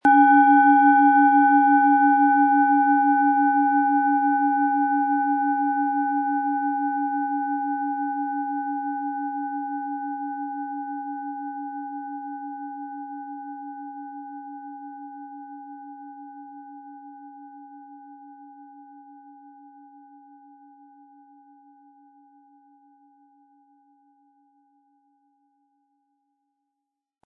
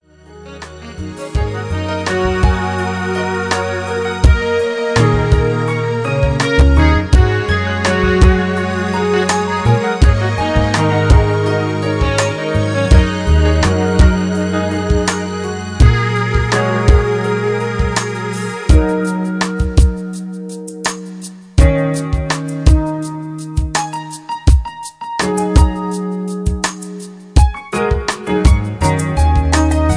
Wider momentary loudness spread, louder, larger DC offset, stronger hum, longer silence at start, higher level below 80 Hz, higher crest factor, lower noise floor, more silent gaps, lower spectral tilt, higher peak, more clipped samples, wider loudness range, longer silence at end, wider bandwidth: first, 25 LU vs 10 LU; second, -21 LUFS vs -15 LUFS; neither; neither; second, 0.05 s vs 0.3 s; second, -82 dBFS vs -18 dBFS; about the same, 18 dB vs 14 dB; first, -84 dBFS vs -38 dBFS; neither; about the same, -6.5 dB/octave vs -6 dB/octave; second, -6 dBFS vs 0 dBFS; neither; first, 25 LU vs 4 LU; first, 8.45 s vs 0 s; second, 3.5 kHz vs 10.5 kHz